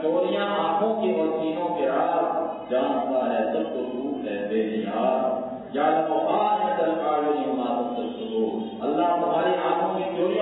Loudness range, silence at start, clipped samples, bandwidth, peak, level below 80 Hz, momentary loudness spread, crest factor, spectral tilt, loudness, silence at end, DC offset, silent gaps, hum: 2 LU; 0 s; under 0.1%; 4.1 kHz; -10 dBFS; -66 dBFS; 6 LU; 14 dB; -9.5 dB/octave; -25 LUFS; 0 s; under 0.1%; none; none